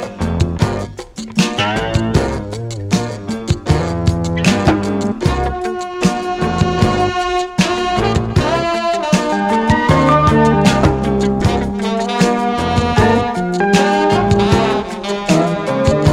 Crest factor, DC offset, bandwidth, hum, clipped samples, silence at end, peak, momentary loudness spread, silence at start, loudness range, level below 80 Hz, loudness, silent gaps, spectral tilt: 14 dB; under 0.1%; 15 kHz; none; under 0.1%; 0 s; 0 dBFS; 8 LU; 0 s; 4 LU; -28 dBFS; -15 LUFS; none; -6 dB/octave